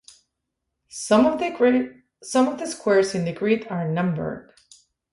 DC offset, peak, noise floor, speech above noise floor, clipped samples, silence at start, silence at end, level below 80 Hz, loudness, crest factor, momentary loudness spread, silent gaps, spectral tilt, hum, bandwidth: under 0.1%; -4 dBFS; -80 dBFS; 59 dB; under 0.1%; 0.95 s; 0.7 s; -60 dBFS; -22 LUFS; 18 dB; 15 LU; none; -5.5 dB/octave; none; 11.5 kHz